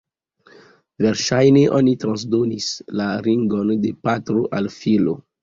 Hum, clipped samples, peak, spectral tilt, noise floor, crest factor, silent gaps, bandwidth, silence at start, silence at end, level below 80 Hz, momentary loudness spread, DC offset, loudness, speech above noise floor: none; under 0.1%; -2 dBFS; -6 dB/octave; -54 dBFS; 16 dB; none; 7.6 kHz; 1 s; 0.2 s; -56 dBFS; 9 LU; under 0.1%; -19 LUFS; 36 dB